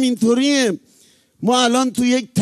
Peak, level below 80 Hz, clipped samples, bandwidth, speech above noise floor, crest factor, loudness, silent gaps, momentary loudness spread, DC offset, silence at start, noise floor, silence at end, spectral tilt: -4 dBFS; -60 dBFS; under 0.1%; 14 kHz; 37 dB; 14 dB; -17 LUFS; none; 7 LU; under 0.1%; 0 s; -54 dBFS; 0 s; -4 dB/octave